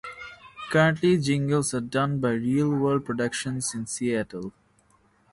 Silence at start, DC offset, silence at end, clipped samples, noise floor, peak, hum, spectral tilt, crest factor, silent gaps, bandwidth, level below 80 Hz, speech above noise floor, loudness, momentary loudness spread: 0.05 s; under 0.1%; 0.8 s; under 0.1%; -63 dBFS; -8 dBFS; none; -5.5 dB/octave; 18 dB; none; 11.5 kHz; -58 dBFS; 38 dB; -25 LUFS; 17 LU